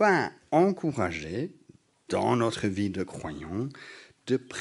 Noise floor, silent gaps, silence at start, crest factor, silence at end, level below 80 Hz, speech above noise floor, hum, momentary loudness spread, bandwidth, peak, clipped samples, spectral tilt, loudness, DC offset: -56 dBFS; none; 0 s; 20 dB; 0 s; -60 dBFS; 28 dB; none; 14 LU; 11.5 kHz; -8 dBFS; under 0.1%; -6 dB/octave; -29 LUFS; under 0.1%